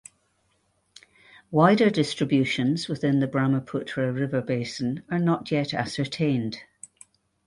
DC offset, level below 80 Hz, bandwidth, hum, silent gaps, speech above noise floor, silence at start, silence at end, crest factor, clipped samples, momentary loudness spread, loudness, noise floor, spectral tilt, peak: under 0.1%; -62 dBFS; 11.5 kHz; none; none; 45 dB; 1.5 s; 0.85 s; 20 dB; under 0.1%; 10 LU; -25 LUFS; -69 dBFS; -6.5 dB/octave; -4 dBFS